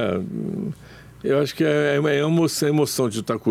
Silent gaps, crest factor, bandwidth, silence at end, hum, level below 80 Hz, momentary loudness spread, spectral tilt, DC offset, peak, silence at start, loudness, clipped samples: none; 12 dB; 16 kHz; 0 s; none; -58 dBFS; 11 LU; -5.5 dB/octave; under 0.1%; -8 dBFS; 0 s; -22 LUFS; under 0.1%